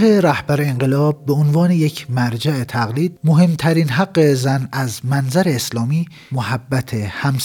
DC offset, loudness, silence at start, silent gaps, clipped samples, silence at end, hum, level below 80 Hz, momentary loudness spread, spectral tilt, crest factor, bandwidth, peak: under 0.1%; -17 LUFS; 0 s; none; under 0.1%; 0 s; none; -54 dBFS; 8 LU; -6.5 dB/octave; 14 dB; 18.5 kHz; -4 dBFS